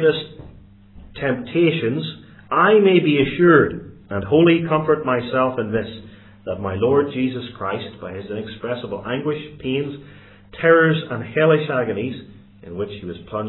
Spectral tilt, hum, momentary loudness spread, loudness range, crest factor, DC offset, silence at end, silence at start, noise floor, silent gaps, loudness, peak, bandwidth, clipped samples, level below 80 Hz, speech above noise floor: -11 dB/octave; none; 17 LU; 8 LU; 20 dB; under 0.1%; 0 s; 0 s; -44 dBFS; none; -19 LUFS; 0 dBFS; 4.2 kHz; under 0.1%; -52 dBFS; 26 dB